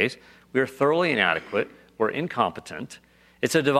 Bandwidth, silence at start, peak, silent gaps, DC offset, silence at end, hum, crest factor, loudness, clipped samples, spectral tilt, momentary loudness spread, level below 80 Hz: 15 kHz; 0 s; -4 dBFS; none; under 0.1%; 0 s; none; 20 dB; -25 LUFS; under 0.1%; -4.5 dB/octave; 16 LU; -64 dBFS